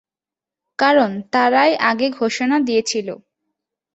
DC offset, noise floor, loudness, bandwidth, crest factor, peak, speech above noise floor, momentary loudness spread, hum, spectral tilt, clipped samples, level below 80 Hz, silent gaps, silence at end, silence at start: under 0.1%; -89 dBFS; -17 LUFS; 8.2 kHz; 18 dB; -2 dBFS; 72 dB; 12 LU; none; -3.5 dB/octave; under 0.1%; -66 dBFS; none; 0.8 s; 0.8 s